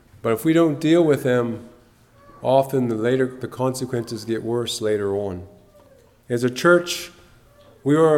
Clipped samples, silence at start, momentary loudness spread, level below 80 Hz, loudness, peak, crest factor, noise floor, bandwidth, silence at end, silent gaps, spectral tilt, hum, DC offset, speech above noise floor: under 0.1%; 0.25 s; 11 LU; -58 dBFS; -21 LUFS; -2 dBFS; 18 dB; -52 dBFS; 16.5 kHz; 0 s; none; -6 dB/octave; none; under 0.1%; 33 dB